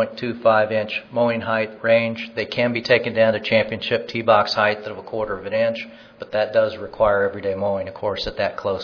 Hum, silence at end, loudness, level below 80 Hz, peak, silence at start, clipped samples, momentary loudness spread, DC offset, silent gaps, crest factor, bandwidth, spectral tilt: none; 0 s; -21 LUFS; -52 dBFS; -2 dBFS; 0 s; under 0.1%; 9 LU; under 0.1%; none; 18 dB; 5.4 kHz; -6 dB/octave